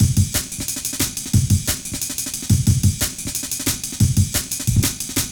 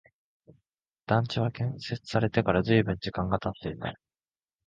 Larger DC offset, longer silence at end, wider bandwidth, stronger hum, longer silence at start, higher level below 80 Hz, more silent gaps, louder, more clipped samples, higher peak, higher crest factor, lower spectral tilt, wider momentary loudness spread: neither; second, 0 s vs 0.75 s; first, over 20 kHz vs 7.6 kHz; neither; second, 0 s vs 1.1 s; first, -32 dBFS vs -52 dBFS; neither; first, -20 LUFS vs -29 LUFS; neither; first, -4 dBFS vs -8 dBFS; second, 16 dB vs 22 dB; second, -4 dB/octave vs -7.5 dB/octave; second, 6 LU vs 11 LU